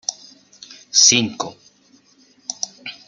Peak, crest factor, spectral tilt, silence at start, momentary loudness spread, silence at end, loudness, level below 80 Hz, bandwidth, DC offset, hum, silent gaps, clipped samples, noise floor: -2 dBFS; 22 dB; -0.5 dB/octave; 0.1 s; 20 LU; 0.15 s; -16 LUFS; -66 dBFS; 11 kHz; under 0.1%; none; none; under 0.1%; -55 dBFS